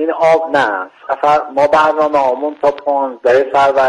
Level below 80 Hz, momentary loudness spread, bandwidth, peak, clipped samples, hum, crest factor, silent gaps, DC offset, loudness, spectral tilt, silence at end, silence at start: -54 dBFS; 6 LU; 11 kHz; -2 dBFS; under 0.1%; none; 12 dB; none; under 0.1%; -13 LUFS; -5 dB/octave; 0 s; 0 s